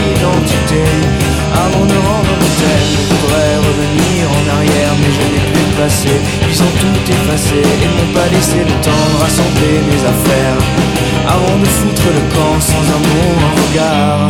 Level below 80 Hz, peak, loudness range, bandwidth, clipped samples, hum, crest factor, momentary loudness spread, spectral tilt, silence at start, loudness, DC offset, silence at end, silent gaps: -24 dBFS; 0 dBFS; 0 LU; 17.5 kHz; under 0.1%; none; 10 dB; 1 LU; -5 dB/octave; 0 s; -11 LUFS; under 0.1%; 0 s; none